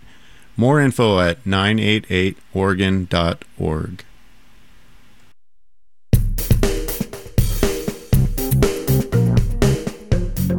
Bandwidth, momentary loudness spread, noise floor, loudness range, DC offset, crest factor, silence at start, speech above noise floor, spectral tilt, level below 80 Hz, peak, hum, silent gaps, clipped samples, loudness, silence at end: over 20 kHz; 8 LU; -70 dBFS; 7 LU; 0.8%; 18 dB; 0.55 s; 52 dB; -6 dB/octave; -26 dBFS; -2 dBFS; none; none; under 0.1%; -19 LUFS; 0 s